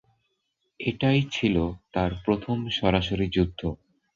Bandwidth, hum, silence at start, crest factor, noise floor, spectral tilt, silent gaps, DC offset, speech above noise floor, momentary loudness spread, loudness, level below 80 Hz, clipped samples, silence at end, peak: 7.4 kHz; none; 0.8 s; 20 dB; -76 dBFS; -7 dB/octave; none; under 0.1%; 51 dB; 9 LU; -26 LUFS; -42 dBFS; under 0.1%; 0.4 s; -8 dBFS